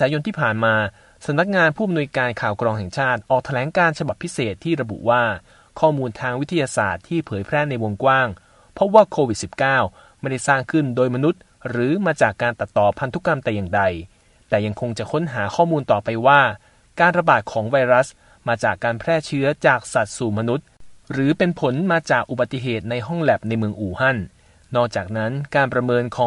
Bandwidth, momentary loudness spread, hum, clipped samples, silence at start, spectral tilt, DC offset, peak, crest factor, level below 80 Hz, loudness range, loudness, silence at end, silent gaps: 11.5 kHz; 8 LU; none; under 0.1%; 0 s; -6 dB/octave; under 0.1%; 0 dBFS; 20 dB; -52 dBFS; 3 LU; -20 LUFS; 0 s; none